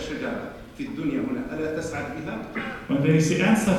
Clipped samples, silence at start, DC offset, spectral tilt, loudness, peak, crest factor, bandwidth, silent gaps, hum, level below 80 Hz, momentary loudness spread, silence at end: under 0.1%; 0 s; under 0.1%; -6 dB/octave; -26 LUFS; -6 dBFS; 18 dB; 13.5 kHz; none; none; -50 dBFS; 13 LU; 0 s